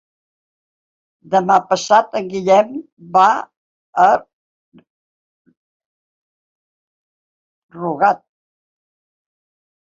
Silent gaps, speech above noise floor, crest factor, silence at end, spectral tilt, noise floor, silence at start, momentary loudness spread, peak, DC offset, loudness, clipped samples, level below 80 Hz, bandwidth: 2.92-2.97 s, 3.57-3.93 s, 4.33-4.72 s, 4.90-5.45 s, 5.57-5.80 s, 5.86-7.69 s; over 75 dB; 18 dB; 1.65 s; -4.5 dB/octave; under -90 dBFS; 1.3 s; 12 LU; -2 dBFS; under 0.1%; -16 LUFS; under 0.1%; -66 dBFS; 7.8 kHz